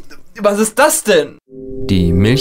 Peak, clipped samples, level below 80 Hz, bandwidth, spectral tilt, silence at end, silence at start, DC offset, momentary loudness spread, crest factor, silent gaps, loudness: 0 dBFS; under 0.1%; -32 dBFS; 16.5 kHz; -4.5 dB/octave; 0 s; 0 s; under 0.1%; 16 LU; 14 dB; none; -13 LUFS